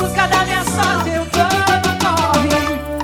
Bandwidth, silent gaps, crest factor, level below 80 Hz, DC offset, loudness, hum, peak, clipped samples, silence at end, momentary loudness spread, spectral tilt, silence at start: over 20 kHz; none; 16 dB; -34 dBFS; under 0.1%; -15 LUFS; none; 0 dBFS; under 0.1%; 0 s; 4 LU; -4 dB/octave; 0 s